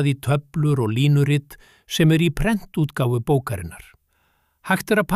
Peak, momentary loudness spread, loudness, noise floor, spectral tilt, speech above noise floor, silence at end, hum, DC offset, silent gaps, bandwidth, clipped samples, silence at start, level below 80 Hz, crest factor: -6 dBFS; 11 LU; -21 LUFS; -65 dBFS; -6.5 dB/octave; 45 dB; 0 s; none; under 0.1%; none; 15 kHz; under 0.1%; 0 s; -40 dBFS; 16 dB